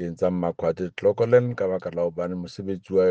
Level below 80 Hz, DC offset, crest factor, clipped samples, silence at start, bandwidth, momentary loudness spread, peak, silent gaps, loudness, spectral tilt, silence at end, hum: -62 dBFS; under 0.1%; 18 dB; under 0.1%; 0 s; 7.6 kHz; 11 LU; -6 dBFS; none; -25 LUFS; -8 dB/octave; 0 s; none